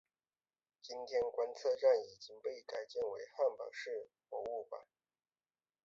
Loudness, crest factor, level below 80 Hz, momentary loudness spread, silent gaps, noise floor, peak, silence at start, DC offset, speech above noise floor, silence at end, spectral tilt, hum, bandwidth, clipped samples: -39 LUFS; 20 dB; -82 dBFS; 17 LU; none; under -90 dBFS; -20 dBFS; 0.85 s; under 0.1%; over 51 dB; 1.05 s; -0.5 dB/octave; none; 7.6 kHz; under 0.1%